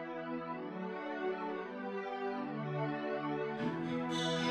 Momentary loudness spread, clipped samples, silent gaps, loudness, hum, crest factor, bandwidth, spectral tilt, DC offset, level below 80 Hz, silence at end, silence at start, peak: 6 LU; under 0.1%; none; -39 LUFS; none; 16 dB; 12 kHz; -5.5 dB/octave; under 0.1%; -78 dBFS; 0 s; 0 s; -22 dBFS